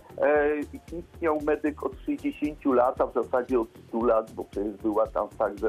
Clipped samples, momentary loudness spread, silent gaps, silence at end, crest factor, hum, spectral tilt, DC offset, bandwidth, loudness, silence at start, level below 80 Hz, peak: under 0.1%; 9 LU; none; 0 s; 16 dB; none; -7.5 dB/octave; under 0.1%; 14.5 kHz; -27 LUFS; 0.1 s; -50 dBFS; -10 dBFS